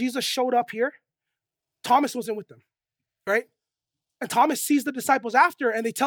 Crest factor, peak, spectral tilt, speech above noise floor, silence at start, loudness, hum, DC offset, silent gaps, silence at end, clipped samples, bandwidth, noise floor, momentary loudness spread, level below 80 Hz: 20 dB; -6 dBFS; -2.5 dB/octave; 64 dB; 0 s; -23 LUFS; none; under 0.1%; none; 0 s; under 0.1%; over 20 kHz; -87 dBFS; 13 LU; -82 dBFS